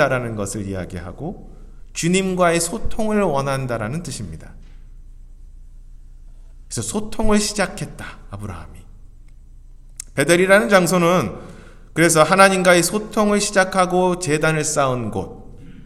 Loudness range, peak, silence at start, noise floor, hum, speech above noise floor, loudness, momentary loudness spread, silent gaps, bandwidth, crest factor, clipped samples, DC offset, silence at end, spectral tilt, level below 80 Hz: 11 LU; 0 dBFS; 0 s; -41 dBFS; none; 23 dB; -18 LUFS; 20 LU; none; 15.5 kHz; 20 dB; under 0.1%; under 0.1%; 0 s; -4.5 dB/octave; -36 dBFS